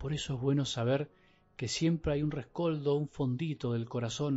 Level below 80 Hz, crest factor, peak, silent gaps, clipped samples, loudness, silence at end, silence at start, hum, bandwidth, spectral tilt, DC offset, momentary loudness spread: -54 dBFS; 14 dB; -18 dBFS; none; under 0.1%; -33 LUFS; 0 s; 0 s; none; 8 kHz; -6.5 dB/octave; under 0.1%; 5 LU